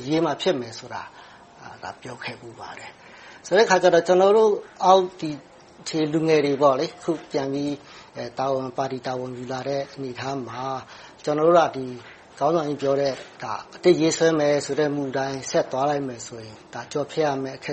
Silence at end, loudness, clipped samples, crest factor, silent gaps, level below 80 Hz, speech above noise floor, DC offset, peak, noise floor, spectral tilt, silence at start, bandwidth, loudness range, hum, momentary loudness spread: 0 s; -23 LUFS; under 0.1%; 20 dB; none; -64 dBFS; 21 dB; under 0.1%; -2 dBFS; -44 dBFS; -5 dB/octave; 0 s; 8.4 kHz; 9 LU; none; 20 LU